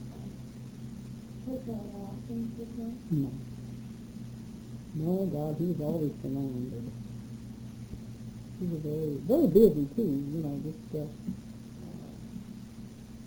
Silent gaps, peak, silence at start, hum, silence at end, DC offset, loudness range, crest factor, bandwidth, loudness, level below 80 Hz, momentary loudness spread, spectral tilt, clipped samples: none; -10 dBFS; 0 s; none; 0 s; under 0.1%; 9 LU; 24 dB; over 20 kHz; -32 LUFS; -54 dBFS; 15 LU; -9 dB/octave; under 0.1%